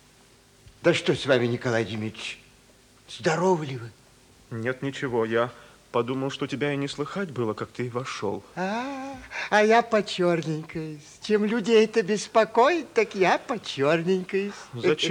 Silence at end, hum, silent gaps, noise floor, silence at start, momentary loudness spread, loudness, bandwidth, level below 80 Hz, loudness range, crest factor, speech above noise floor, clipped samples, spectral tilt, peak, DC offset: 0 s; none; none; -56 dBFS; 0.8 s; 14 LU; -25 LUFS; 11 kHz; -64 dBFS; 7 LU; 18 dB; 31 dB; under 0.1%; -5 dB/octave; -8 dBFS; under 0.1%